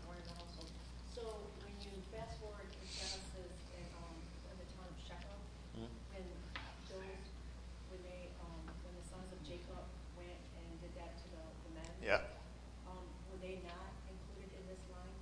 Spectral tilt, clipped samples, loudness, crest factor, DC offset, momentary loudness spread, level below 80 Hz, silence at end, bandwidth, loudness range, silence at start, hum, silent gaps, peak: -4.5 dB/octave; under 0.1%; -50 LUFS; 32 dB; under 0.1%; 8 LU; -54 dBFS; 0 s; 10.5 kHz; 7 LU; 0 s; none; none; -18 dBFS